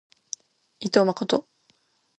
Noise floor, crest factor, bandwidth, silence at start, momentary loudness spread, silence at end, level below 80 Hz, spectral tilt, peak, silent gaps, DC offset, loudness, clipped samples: -66 dBFS; 24 dB; 10 kHz; 0.8 s; 16 LU; 0.75 s; -70 dBFS; -4.5 dB/octave; -2 dBFS; none; under 0.1%; -24 LUFS; under 0.1%